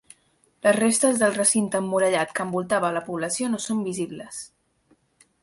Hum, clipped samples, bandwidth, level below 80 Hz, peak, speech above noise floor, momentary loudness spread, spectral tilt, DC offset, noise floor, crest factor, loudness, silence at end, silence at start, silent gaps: none; under 0.1%; 12 kHz; -68 dBFS; -6 dBFS; 41 dB; 13 LU; -3.5 dB/octave; under 0.1%; -64 dBFS; 18 dB; -23 LUFS; 0.95 s; 0.65 s; none